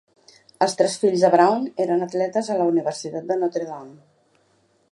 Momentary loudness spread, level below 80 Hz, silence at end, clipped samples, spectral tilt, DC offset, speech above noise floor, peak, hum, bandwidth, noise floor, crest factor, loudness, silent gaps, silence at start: 12 LU; -76 dBFS; 1 s; under 0.1%; -5 dB/octave; under 0.1%; 42 dB; -2 dBFS; none; 11.5 kHz; -63 dBFS; 20 dB; -21 LUFS; none; 0.6 s